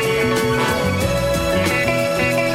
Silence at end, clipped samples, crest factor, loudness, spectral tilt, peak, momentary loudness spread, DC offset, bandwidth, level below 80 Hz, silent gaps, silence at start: 0 s; under 0.1%; 12 dB; -18 LUFS; -4.5 dB/octave; -6 dBFS; 2 LU; under 0.1%; 16.5 kHz; -34 dBFS; none; 0 s